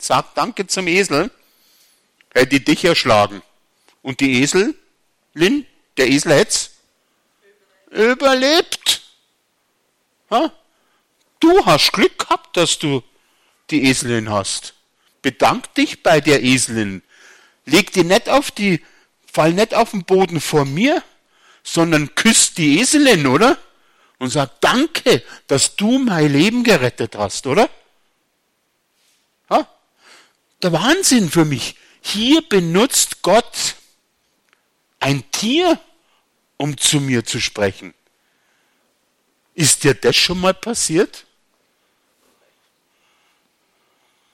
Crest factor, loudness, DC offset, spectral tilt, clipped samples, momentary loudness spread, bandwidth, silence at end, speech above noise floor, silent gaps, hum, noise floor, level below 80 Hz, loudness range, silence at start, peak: 16 dB; -16 LUFS; under 0.1%; -3.5 dB/octave; under 0.1%; 10 LU; 16.5 kHz; 3.15 s; 51 dB; none; none; -67 dBFS; -50 dBFS; 6 LU; 0 s; -2 dBFS